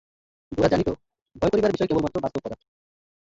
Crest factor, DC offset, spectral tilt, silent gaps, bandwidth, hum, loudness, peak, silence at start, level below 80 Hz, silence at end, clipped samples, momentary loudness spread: 18 dB; under 0.1%; -7 dB/octave; 1.22-1.26 s; 7.8 kHz; none; -24 LUFS; -6 dBFS; 0.5 s; -48 dBFS; 0.7 s; under 0.1%; 16 LU